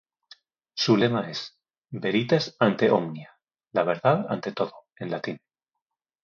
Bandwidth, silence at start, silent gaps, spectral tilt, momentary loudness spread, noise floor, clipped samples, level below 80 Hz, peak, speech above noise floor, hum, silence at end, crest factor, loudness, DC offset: 7.2 kHz; 0.75 s; none; -6 dB/octave; 17 LU; -86 dBFS; under 0.1%; -68 dBFS; -6 dBFS; 61 dB; none; 0.85 s; 20 dB; -25 LUFS; under 0.1%